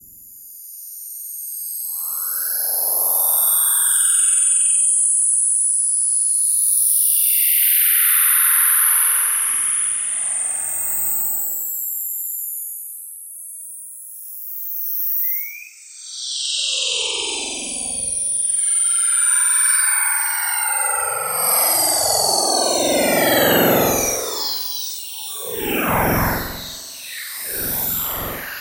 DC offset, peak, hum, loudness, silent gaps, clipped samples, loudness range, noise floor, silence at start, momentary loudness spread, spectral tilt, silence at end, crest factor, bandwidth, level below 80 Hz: under 0.1%; -2 dBFS; none; -16 LUFS; none; under 0.1%; 10 LU; -41 dBFS; 0.05 s; 17 LU; -1 dB/octave; 0 s; 16 dB; 16.5 kHz; -46 dBFS